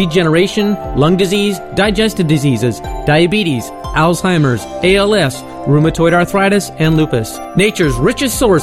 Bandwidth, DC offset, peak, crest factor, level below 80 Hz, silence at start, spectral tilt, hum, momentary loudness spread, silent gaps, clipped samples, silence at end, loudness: 15.5 kHz; under 0.1%; -2 dBFS; 12 dB; -30 dBFS; 0 s; -5.5 dB/octave; none; 6 LU; none; under 0.1%; 0 s; -13 LUFS